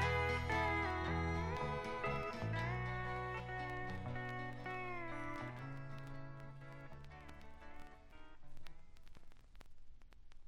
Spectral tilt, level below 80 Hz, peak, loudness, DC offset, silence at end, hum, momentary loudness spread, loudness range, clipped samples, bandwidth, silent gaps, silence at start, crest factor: -6.5 dB/octave; -54 dBFS; -24 dBFS; -42 LUFS; under 0.1%; 0 s; none; 23 LU; 19 LU; under 0.1%; 13 kHz; none; 0 s; 20 dB